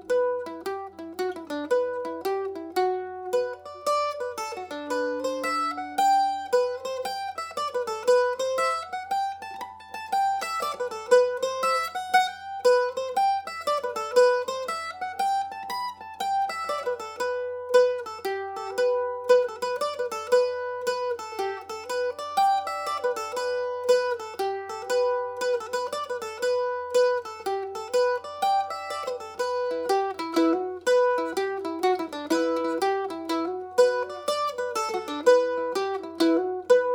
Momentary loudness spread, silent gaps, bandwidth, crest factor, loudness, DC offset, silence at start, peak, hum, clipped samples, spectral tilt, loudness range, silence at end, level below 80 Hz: 10 LU; none; 18 kHz; 20 dB; -26 LUFS; under 0.1%; 0 s; -6 dBFS; none; under 0.1%; -2.5 dB/octave; 4 LU; 0 s; -74 dBFS